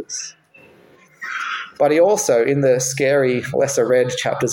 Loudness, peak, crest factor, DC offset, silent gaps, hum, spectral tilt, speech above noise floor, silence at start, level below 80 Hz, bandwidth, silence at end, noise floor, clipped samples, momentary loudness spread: -18 LUFS; -4 dBFS; 14 dB; under 0.1%; none; none; -4 dB/octave; 33 dB; 0 s; -62 dBFS; 17 kHz; 0 s; -50 dBFS; under 0.1%; 13 LU